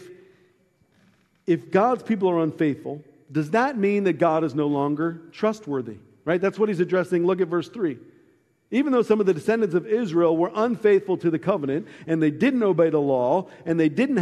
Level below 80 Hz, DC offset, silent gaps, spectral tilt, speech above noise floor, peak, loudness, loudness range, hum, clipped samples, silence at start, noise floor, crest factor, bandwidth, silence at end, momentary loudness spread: -70 dBFS; under 0.1%; none; -7.5 dB/octave; 41 dB; -6 dBFS; -23 LUFS; 3 LU; none; under 0.1%; 0 s; -63 dBFS; 18 dB; 11.5 kHz; 0 s; 9 LU